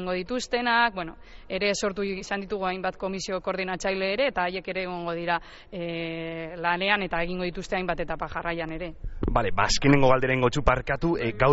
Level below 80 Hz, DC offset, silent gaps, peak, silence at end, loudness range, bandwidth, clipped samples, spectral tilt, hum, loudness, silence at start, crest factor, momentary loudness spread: -40 dBFS; under 0.1%; none; -6 dBFS; 0 s; 4 LU; 8 kHz; under 0.1%; -3.5 dB/octave; none; -27 LUFS; 0 s; 20 dB; 11 LU